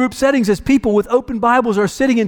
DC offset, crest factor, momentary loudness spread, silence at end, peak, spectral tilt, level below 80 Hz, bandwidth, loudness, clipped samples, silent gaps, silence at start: under 0.1%; 12 dB; 2 LU; 0 s; -4 dBFS; -5.5 dB/octave; -40 dBFS; 18 kHz; -15 LUFS; under 0.1%; none; 0 s